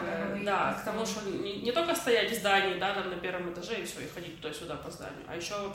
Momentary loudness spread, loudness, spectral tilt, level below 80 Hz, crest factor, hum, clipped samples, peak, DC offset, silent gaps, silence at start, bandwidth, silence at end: 14 LU; -32 LUFS; -3.5 dB/octave; -60 dBFS; 18 dB; none; under 0.1%; -14 dBFS; under 0.1%; none; 0 s; 16.5 kHz; 0 s